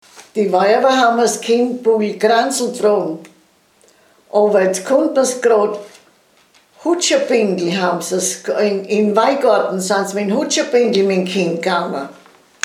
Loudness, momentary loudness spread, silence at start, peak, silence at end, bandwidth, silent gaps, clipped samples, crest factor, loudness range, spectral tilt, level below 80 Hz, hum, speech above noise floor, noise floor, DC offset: -16 LUFS; 7 LU; 0.15 s; 0 dBFS; 0.55 s; 15.5 kHz; none; under 0.1%; 16 dB; 2 LU; -4 dB/octave; -74 dBFS; none; 39 dB; -54 dBFS; under 0.1%